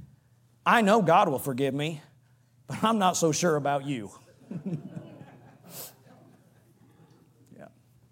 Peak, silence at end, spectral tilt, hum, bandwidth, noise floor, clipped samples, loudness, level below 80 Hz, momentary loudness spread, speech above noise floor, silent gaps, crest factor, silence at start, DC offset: -6 dBFS; 0.45 s; -4.5 dB/octave; none; 16.5 kHz; -62 dBFS; under 0.1%; -26 LUFS; -76 dBFS; 23 LU; 37 dB; none; 22 dB; 0 s; under 0.1%